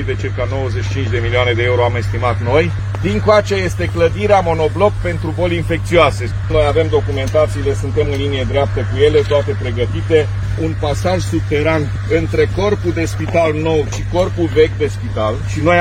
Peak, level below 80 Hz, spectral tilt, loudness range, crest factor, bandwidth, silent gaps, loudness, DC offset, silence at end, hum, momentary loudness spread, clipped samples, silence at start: 0 dBFS; -28 dBFS; -6.5 dB/octave; 2 LU; 14 dB; 10.5 kHz; none; -16 LUFS; under 0.1%; 0 s; none; 6 LU; under 0.1%; 0 s